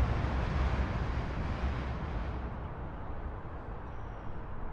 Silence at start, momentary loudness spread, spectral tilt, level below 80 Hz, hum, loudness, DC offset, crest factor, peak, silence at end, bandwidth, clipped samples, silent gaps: 0 s; 11 LU; -7.5 dB/octave; -38 dBFS; none; -37 LUFS; under 0.1%; 16 dB; -20 dBFS; 0 s; 7.2 kHz; under 0.1%; none